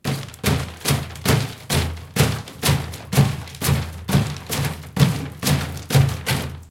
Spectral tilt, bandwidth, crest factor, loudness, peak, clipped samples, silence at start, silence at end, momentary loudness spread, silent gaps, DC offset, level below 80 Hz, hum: -5 dB/octave; 17 kHz; 20 dB; -22 LUFS; -2 dBFS; under 0.1%; 0.05 s; 0 s; 5 LU; none; under 0.1%; -40 dBFS; none